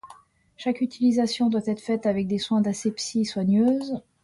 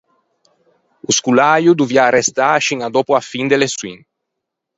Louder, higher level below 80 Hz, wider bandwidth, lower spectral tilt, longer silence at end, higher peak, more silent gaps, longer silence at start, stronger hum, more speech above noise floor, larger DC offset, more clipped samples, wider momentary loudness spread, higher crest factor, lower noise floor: second, -24 LUFS vs -14 LUFS; about the same, -62 dBFS vs -60 dBFS; first, 11.5 kHz vs 8.2 kHz; first, -5.5 dB/octave vs -3.5 dB/octave; second, 0.25 s vs 0.8 s; second, -12 dBFS vs 0 dBFS; neither; second, 0.05 s vs 1.1 s; neither; second, 29 dB vs 64 dB; neither; neither; about the same, 6 LU vs 7 LU; about the same, 14 dB vs 16 dB; second, -52 dBFS vs -78 dBFS